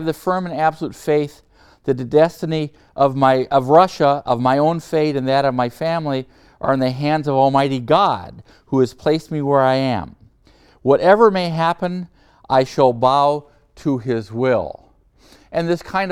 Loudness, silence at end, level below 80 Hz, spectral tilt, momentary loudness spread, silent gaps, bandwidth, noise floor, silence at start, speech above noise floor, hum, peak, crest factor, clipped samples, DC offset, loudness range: -18 LUFS; 0 s; -52 dBFS; -7 dB/octave; 12 LU; none; 15 kHz; -52 dBFS; 0 s; 35 dB; none; 0 dBFS; 18 dB; under 0.1%; under 0.1%; 3 LU